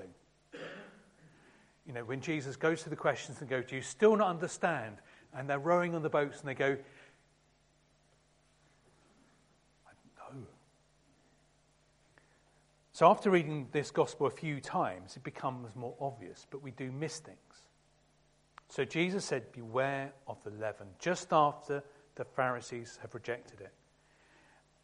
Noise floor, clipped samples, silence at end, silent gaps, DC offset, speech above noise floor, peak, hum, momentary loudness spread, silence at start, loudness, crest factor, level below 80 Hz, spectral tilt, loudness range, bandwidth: -70 dBFS; under 0.1%; 1.15 s; none; under 0.1%; 36 dB; -10 dBFS; none; 22 LU; 0 s; -34 LUFS; 26 dB; -74 dBFS; -5.5 dB/octave; 9 LU; 11.5 kHz